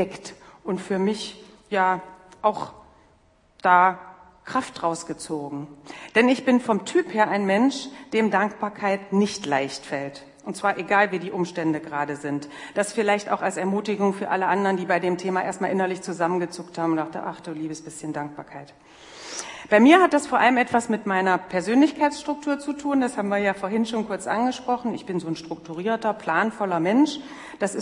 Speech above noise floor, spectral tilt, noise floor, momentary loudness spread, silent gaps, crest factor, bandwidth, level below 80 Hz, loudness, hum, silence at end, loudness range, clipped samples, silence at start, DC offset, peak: 36 dB; -5 dB/octave; -59 dBFS; 14 LU; none; 24 dB; 11 kHz; -66 dBFS; -23 LUFS; none; 0 s; 6 LU; under 0.1%; 0 s; under 0.1%; 0 dBFS